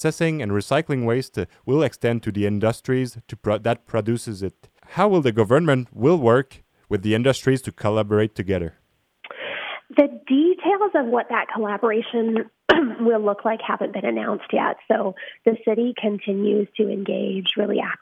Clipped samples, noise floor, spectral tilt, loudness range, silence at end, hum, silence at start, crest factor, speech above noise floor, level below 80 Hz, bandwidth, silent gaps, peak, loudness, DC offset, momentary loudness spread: under 0.1%; -48 dBFS; -6.5 dB/octave; 3 LU; 0.05 s; none; 0 s; 18 dB; 27 dB; -56 dBFS; 14.5 kHz; none; -2 dBFS; -22 LUFS; under 0.1%; 10 LU